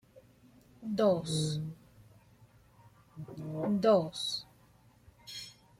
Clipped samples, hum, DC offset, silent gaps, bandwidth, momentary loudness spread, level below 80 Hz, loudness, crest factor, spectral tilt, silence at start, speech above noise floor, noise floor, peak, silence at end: under 0.1%; none; under 0.1%; none; 15.5 kHz; 22 LU; -68 dBFS; -32 LUFS; 20 dB; -5.5 dB/octave; 0.15 s; 33 dB; -63 dBFS; -14 dBFS; 0.25 s